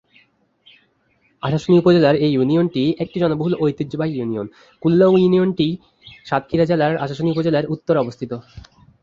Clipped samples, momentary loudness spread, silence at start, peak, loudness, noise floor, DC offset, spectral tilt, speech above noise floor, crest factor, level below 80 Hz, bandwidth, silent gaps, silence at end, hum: under 0.1%; 12 LU; 1.45 s; -2 dBFS; -18 LUFS; -62 dBFS; under 0.1%; -8.5 dB/octave; 44 dB; 16 dB; -52 dBFS; 7.4 kHz; none; 0.45 s; none